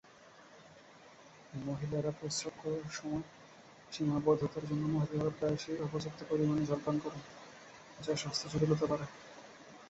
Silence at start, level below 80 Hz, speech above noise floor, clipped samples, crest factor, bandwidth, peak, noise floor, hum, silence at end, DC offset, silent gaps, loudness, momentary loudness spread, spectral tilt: 0.2 s; -64 dBFS; 23 dB; under 0.1%; 20 dB; 8.2 kHz; -18 dBFS; -59 dBFS; none; 0 s; under 0.1%; none; -36 LUFS; 24 LU; -6 dB/octave